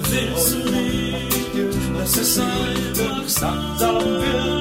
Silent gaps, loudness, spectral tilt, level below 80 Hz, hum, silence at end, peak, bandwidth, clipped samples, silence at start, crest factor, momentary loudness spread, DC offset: none; -20 LUFS; -3.5 dB/octave; -34 dBFS; none; 0 s; -6 dBFS; 16.5 kHz; under 0.1%; 0 s; 14 dB; 4 LU; under 0.1%